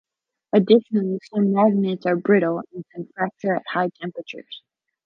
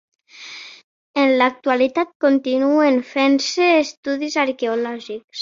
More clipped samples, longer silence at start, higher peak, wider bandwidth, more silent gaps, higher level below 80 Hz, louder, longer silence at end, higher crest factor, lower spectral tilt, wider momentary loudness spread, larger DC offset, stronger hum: neither; first, 0.55 s vs 0.4 s; about the same, -4 dBFS vs -2 dBFS; second, 5.8 kHz vs 7.6 kHz; second, none vs 0.84-1.14 s, 2.15-2.20 s, 3.97-4.03 s, 5.24-5.28 s; second, -74 dBFS vs -68 dBFS; second, -21 LUFS vs -18 LUFS; first, 0.45 s vs 0 s; about the same, 18 dB vs 16 dB; first, -8.5 dB/octave vs -2.5 dB/octave; about the same, 18 LU vs 16 LU; neither; neither